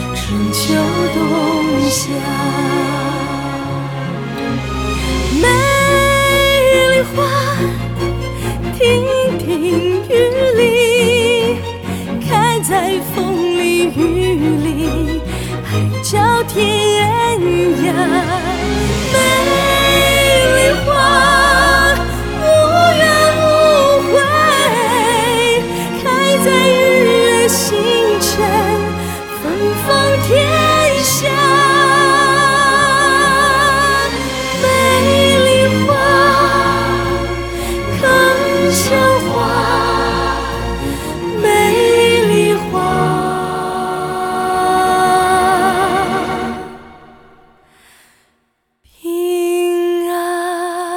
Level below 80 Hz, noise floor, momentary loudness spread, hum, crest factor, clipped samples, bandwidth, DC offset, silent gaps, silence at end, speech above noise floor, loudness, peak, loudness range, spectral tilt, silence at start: -30 dBFS; -64 dBFS; 10 LU; none; 14 dB; under 0.1%; 19.5 kHz; under 0.1%; none; 0 s; 50 dB; -13 LUFS; 0 dBFS; 6 LU; -4 dB/octave; 0 s